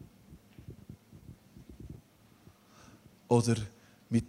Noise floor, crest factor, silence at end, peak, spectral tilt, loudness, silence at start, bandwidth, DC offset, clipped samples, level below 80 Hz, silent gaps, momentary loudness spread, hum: -60 dBFS; 24 dB; 0 s; -12 dBFS; -6.5 dB/octave; -31 LUFS; 0 s; 13.5 kHz; under 0.1%; under 0.1%; -60 dBFS; none; 28 LU; none